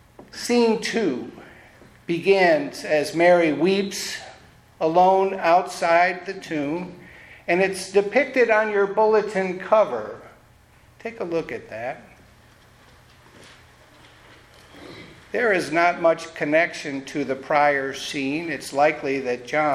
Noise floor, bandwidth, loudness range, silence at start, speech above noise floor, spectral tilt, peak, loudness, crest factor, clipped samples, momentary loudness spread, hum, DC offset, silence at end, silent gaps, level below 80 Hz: -53 dBFS; 15 kHz; 14 LU; 0.35 s; 32 dB; -4.5 dB/octave; -4 dBFS; -21 LUFS; 18 dB; under 0.1%; 15 LU; none; under 0.1%; 0 s; none; -62 dBFS